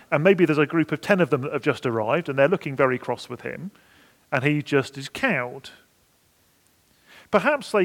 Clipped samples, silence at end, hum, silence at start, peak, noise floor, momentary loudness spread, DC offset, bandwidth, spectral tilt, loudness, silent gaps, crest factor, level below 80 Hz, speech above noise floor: under 0.1%; 0 s; none; 0.1 s; -2 dBFS; -62 dBFS; 14 LU; under 0.1%; 17 kHz; -6.5 dB/octave; -23 LUFS; none; 22 dB; -66 dBFS; 40 dB